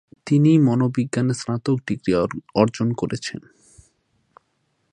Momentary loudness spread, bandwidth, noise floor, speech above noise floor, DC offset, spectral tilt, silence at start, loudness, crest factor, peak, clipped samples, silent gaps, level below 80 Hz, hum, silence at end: 10 LU; 10.5 kHz; -69 dBFS; 49 dB; under 0.1%; -7 dB/octave; 0.25 s; -21 LUFS; 20 dB; -2 dBFS; under 0.1%; none; -56 dBFS; none; 1.55 s